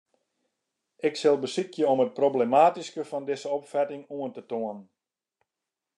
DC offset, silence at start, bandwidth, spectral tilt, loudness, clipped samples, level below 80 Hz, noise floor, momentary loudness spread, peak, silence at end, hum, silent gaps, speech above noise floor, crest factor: under 0.1%; 1.05 s; 11 kHz; -5 dB/octave; -27 LUFS; under 0.1%; -88 dBFS; -88 dBFS; 14 LU; -8 dBFS; 1.15 s; none; none; 62 dB; 20 dB